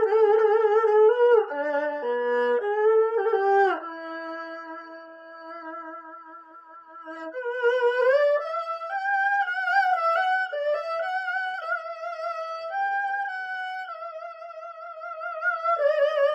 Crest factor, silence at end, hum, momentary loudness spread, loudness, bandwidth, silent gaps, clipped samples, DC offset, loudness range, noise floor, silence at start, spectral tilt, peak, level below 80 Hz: 16 dB; 0 s; none; 19 LU; -24 LUFS; 7.6 kHz; none; under 0.1%; under 0.1%; 9 LU; -47 dBFS; 0 s; -2.5 dB/octave; -10 dBFS; -88 dBFS